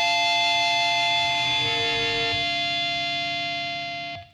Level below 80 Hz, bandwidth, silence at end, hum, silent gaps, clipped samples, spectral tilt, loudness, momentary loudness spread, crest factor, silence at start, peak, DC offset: -56 dBFS; 14 kHz; 0.1 s; none; none; under 0.1%; -1.5 dB/octave; -22 LUFS; 8 LU; 12 dB; 0 s; -12 dBFS; under 0.1%